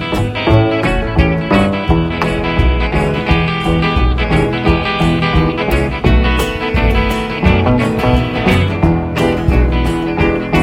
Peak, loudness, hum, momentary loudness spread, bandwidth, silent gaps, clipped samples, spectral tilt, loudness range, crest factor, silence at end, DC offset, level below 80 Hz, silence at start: 0 dBFS; -14 LUFS; none; 3 LU; 16.5 kHz; none; under 0.1%; -7 dB/octave; 1 LU; 12 dB; 0 s; under 0.1%; -18 dBFS; 0 s